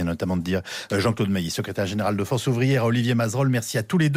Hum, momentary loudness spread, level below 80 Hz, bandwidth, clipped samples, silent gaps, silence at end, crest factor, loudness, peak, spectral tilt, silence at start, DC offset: none; 6 LU; -52 dBFS; 16 kHz; under 0.1%; none; 0 s; 12 dB; -23 LUFS; -12 dBFS; -6 dB/octave; 0 s; under 0.1%